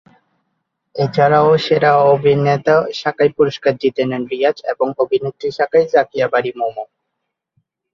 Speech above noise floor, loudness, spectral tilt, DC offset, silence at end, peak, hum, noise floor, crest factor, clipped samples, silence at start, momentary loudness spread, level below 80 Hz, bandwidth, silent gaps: 61 dB; -15 LUFS; -7 dB/octave; under 0.1%; 1.1 s; -2 dBFS; none; -76 dBFS; 14 dB; under 0.1%; 0.95 s; 10 LU; -58 dBFS; 7.2 kHz; none